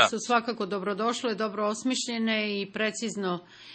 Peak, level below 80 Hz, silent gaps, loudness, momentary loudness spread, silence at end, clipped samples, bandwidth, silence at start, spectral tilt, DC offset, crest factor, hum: -4 dBFS; -76 dBFS; none; -29 LUFS; 5 LU; 0 s; under 0.1%; 8.8 kHz; 0 s; -3.5 dB/octave; under 0.1%; 24 dB; none